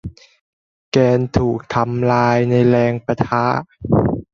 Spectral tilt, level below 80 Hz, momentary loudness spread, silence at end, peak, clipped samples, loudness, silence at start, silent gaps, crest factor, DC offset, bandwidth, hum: -8 dB/octave; -40 dBFS; 6 LU; 0.1 s; -2 dBFS; under 0.1%; -17 LUFS; 0.05 s; 0.41-0.92 s; 16 dB; under 0.1%; 7.4 kHz; none